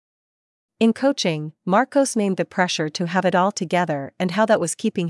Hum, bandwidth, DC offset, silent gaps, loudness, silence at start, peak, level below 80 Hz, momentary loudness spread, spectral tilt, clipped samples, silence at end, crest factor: none; 12 kHz; under 0.1%; none; -21 LUFS; 0.8 s; -4 dBFS; -74 dBFS; 5 LU; -5 dB/octave; under 0.1%; 0 s; 16 dB